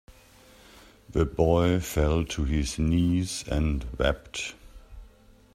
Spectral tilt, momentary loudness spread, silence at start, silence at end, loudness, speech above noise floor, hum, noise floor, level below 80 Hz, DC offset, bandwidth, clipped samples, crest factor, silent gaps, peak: -6 dB/octave; 9 LU; 1.1 s; 0.5 s; -27 LUFS; 29 dB; none; -55 dBFS; -36 dBFS; under 0.1%; 14.5 kHz; under 0.1%; 20 dB; none; -8 dBFS